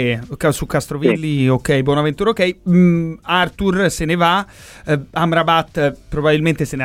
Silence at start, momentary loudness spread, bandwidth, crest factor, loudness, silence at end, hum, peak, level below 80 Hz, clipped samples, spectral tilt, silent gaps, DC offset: 0 s; 6 LU; 16 kHz; 14 dB; -17 LUFS; 0 s; none; -2 dBFS; -38 dBFS; under 0.1%; -6 dB/octave; none; under 0.1%